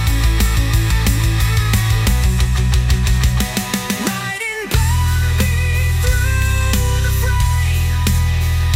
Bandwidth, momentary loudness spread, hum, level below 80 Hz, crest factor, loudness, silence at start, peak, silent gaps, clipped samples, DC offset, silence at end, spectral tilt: 16.5 kHz; 3 LU; none; -18 dBFS; 12 dB; -16 LUFS; 0 s; -2 dBFS; none; under 0.1%; under 0.1%; 0 s; -4.5 dB/octave